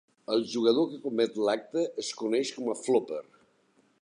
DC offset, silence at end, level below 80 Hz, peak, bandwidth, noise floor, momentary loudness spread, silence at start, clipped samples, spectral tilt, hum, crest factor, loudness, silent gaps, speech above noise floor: under 0.1%; 0.8 s; -82 dBFS; -10 dBFS; 10.5 kHz; -67 dBFS; 7 LU; 0.3 s; under 0.1%; -4 dB/octave; none; 18 dB; -29 LUFS; none; 39 dB